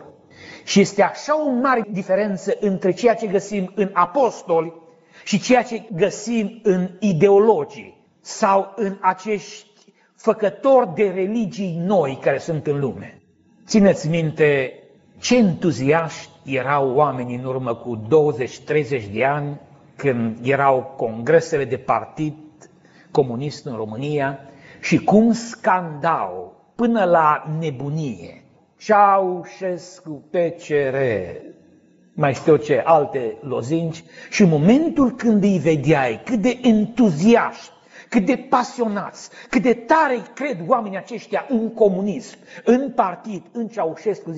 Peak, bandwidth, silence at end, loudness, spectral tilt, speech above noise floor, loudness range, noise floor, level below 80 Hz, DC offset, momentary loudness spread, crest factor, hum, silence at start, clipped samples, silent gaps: -2 dBFS; 8 kHz; 0 s; -19 LUFS; -5.5 dB/octave; 36 dB; 4 LU; -55 dBFS; -58 dBFS; under 0.1%; 13 LU; 18 dB; none; 0 s; under 0.1%; none